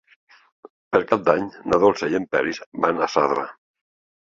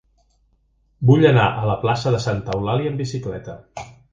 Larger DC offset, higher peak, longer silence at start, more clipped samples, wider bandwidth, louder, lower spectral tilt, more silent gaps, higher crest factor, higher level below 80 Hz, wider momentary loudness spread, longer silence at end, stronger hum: neither; about the same, -2 dBFS vs 0 dBFS; about the same, 0.9 s vs 1 s; neither; about the same, 7.6 kHz vs 7.6 kHz; about the same, -21 LUFS vs -19 LUFS; second, -5.5 dB/octave vs -7 dB/octave; first, 2.66-2.72 s vs none; about the same, 20 dB vs 20 dB; second, -56 dBFS vs -46 dBFS; second, 6 LU vs 21 LU; first, 0.7 s vs 0.2 s; neither